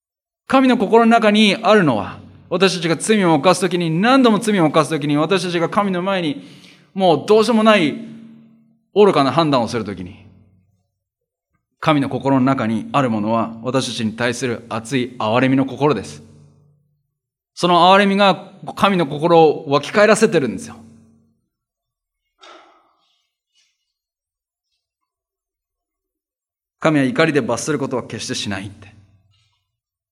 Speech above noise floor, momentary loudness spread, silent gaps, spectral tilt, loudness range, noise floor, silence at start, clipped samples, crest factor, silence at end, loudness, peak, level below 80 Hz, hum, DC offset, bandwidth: 74 dB; 12 LU; none; -5 dB/octave; 7 LU; -89 dBFS; 0.5 s; under 0.1%; 18 dB; 1.3 s; -16 LUFS; 0 dBFS; -64 dBFS; none; under 0.1%; 14 kHz